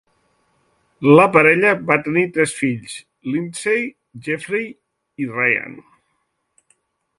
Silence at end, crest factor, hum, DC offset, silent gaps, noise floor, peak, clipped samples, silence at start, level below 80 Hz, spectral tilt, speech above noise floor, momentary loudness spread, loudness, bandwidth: 1.4 s; 20 dB; none; under 0.1%; none; -70 dBFS; 0 dBFS; under 0.1%; 1 s; -62 dBFS; -5.5 dB/octave; 53 dB; 18 LU; -17 LUFS; 11.5 kHz